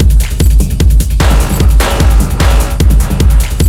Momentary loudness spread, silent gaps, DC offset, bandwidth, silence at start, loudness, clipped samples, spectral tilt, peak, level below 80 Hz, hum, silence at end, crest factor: 1 LU; none; under 0.1%; 16 kHz; 0 s; -10 LUFS; under 0.1%; -5.5 dB/octave; 0 dBFS; -8 dBFS; none; 0 s; 6 dB